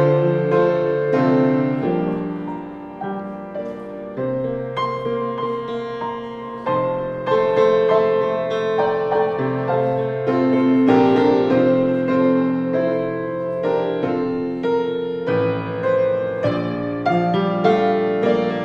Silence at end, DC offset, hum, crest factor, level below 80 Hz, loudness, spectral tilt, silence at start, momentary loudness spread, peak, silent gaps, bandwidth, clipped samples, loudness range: 0 s; under 0.1%; none; 16 dB; -54 dBFS; -19 LUFS; -8.5 dB/octave; 0 s; 12 LU; -2 dBFS; none; 6.8 kHz; under 0.1%; 8 LU